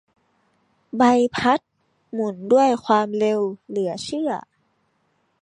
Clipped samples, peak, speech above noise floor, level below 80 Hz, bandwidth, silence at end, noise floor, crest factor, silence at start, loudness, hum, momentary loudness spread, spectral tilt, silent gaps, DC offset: under 0.1%; -4 dBFS; 48 dB; -64 dBFS; 10.5 kHz; 1 s; -68 dBFS; 18 dB; 0.95 s; -21 LUFS; none; 10 LU; -5 dB/octave; none; under 0.1%